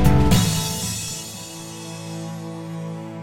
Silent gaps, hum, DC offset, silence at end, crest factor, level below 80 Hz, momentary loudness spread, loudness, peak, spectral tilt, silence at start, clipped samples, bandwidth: none; none; under 0.1%; 0 s; 18 dB; -32 dBFS; 16 LU; -24 LUFS; -4 dBFS; -5 dB/octave; 0 s; under 0.1%; 17 kHz